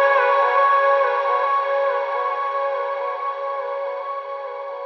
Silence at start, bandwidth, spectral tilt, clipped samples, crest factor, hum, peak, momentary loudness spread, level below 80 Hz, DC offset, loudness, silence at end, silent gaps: 0 s; 6.2 kHz; 0.5 dB/octave; under 0.1%; 14 dB; none; -6 dBFS; 12 LU; under -90 dBFS; under 0.1%; -21 LUFS; 0 s; none